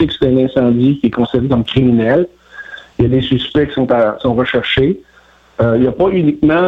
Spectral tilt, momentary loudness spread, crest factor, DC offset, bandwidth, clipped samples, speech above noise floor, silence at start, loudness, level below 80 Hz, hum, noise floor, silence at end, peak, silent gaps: -8.5 dB/octave; 11 LU; 12 dB; under 0.1%; 5.6 kHz; under 0.1%; 35 dB; 0 s; -13 LUFS; -36 dBFS; none; -47 dBFS; 0 s; -2 dBFS; none